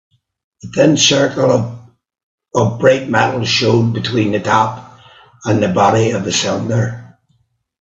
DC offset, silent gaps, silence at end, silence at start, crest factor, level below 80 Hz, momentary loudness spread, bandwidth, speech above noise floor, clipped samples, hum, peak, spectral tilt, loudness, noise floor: under 0.1%; 2.23-2.38 s; 0.75 s; 0.65 s; 16 dB; -52 dBFS; 11 LU; 7.8 kHz; 47 dB; under 0.1%; none; 0 dBFS; -4.5 dB/octave; -14 LUFS; -61 dBFS